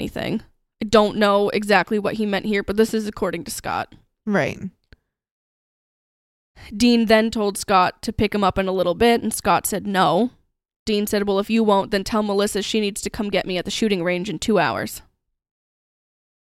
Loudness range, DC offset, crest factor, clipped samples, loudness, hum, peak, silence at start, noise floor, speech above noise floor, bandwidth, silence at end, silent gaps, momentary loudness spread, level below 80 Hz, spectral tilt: 6 LU; under 0.1%; 18 dB; under 0.1%; -20 LUFS; none; -2 dBFS; 0 s; -55 dBFS; 35 dB; 16 kHz; 1.45 s; 5.31-6.54 s, 10.76-10.86 s; 10 LU; -46 dBFS; -4.5 dB/octave